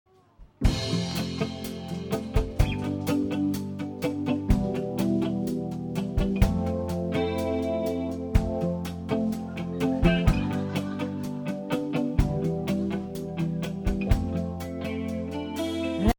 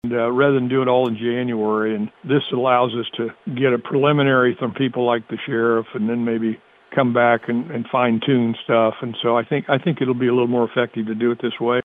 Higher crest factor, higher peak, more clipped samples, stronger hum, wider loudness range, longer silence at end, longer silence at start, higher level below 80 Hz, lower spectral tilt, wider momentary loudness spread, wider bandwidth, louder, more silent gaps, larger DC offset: first, 20 dB vs 14 dB; second, -8 dBFS vs -4 dBFS; neither; neither; about the same, 2 LU vs 1 LU; about the same, 0.05 s vs 0 s; first, 0.4 s vs 0.05 s; first, -34 dBFS vs -64 dBFS; second, -7 dB/octave vs -9.5 dB/octave; about the same, 7 LU vs 7 LU; first, over 20 kHz vs 3.9 kHz; second, -28 LUFS vs -20 LUFS; neither; neither